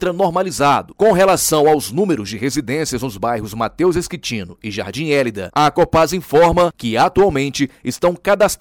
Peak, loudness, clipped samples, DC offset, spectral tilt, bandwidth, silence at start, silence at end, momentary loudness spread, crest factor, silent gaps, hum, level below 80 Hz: -6 dBFS; -16 LUFS; under 0.1%; under 0.1%; -4.5 dB/octave; 19.5 kHz; 0 s; 0.05 s; 10 LU; 10 dB; none; none; -40 dBFS